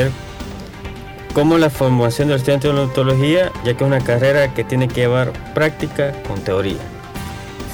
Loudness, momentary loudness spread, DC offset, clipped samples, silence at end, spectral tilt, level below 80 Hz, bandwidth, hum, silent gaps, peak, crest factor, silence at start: -17 LUFS; 16 LU; under 0.1%; under 0.1%; 0 s; -6.5 dB/octave; -38 dBFS; 20 kHz; none; none; 0 dBFS; 16 dB; 0 s